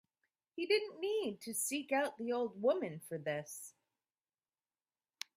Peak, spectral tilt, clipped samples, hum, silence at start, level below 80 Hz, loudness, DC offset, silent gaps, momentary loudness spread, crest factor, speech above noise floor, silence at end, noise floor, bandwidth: -20 dBFS; -3 dB/octave; under 0.1%; none; 0.55 s; -86 dBFS; -37 LUFS; under 0.1%; none; 14 LU; 20 dB; over 53 dB; 1.65 s; under -90 dBFS; 16 kHz